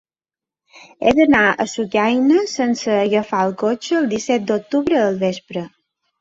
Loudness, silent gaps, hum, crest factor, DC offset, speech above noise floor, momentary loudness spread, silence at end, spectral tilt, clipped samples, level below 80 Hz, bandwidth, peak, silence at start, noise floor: -17 LUFS; none; none; 16 dB; under 0.1%; over 73 dB; 8 LU; 0.55 s; -5 dB/octave; under 0.1%; -54 dBFS; 7.8 kHz; -2 dBFS; 0.75 s; under -90 dBFS